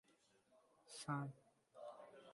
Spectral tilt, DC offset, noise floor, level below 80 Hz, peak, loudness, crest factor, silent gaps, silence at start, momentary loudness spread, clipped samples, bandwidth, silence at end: -5.5 dB/octave; under 0.1%; -77 dBFS; -88 dBFS; -32 dBFS; -51 LUFS; 22 dB; none; 0.1 s; 20 LU; under 0.1%; 11.5 kHz; 0 s